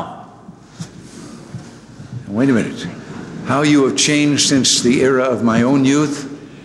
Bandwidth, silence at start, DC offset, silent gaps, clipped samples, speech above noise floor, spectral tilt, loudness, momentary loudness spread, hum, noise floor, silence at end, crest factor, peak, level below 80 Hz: 12.5 kHz; 0 s; under 0.1%; none; under 0.1%; 25 dB; -4 dB/octave; -14 LUFS; 22 LU; none; -39 dBFS; 0 s; 14 dB; -4 dBFS; -52 dBFS